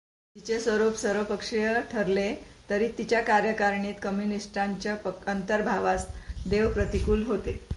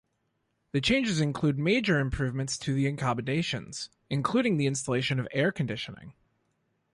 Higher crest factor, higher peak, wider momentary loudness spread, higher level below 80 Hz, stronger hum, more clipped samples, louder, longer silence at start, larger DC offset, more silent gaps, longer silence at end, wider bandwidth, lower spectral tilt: about the same, 16 dB vs 18 dB; about the same, -12 dBFS vs -12 dBFS; about the same, 7 LU vs 9 LU; first, -42 dBFS vs -50 dBFS; neither; neither; about the same, -28 LUFS vs -28 LUFS; second, 0.35 s vs 0.75 s; neither; neither; second, 0 s vs 0.85 s; about the same, 11.5 kHz vs 11.5 kHz; about the same, -5.5 dB/octave vs -5 dB/octave